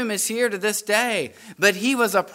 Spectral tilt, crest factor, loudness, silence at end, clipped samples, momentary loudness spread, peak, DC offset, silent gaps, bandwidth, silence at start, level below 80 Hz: -2.5 dB/octave; 20 dB; -21 LUFS; 0 s; under 0.1%; 5 LU; -2 dBFS; under 0.1%; none; 16 kHz; 0 s; -74 dBFS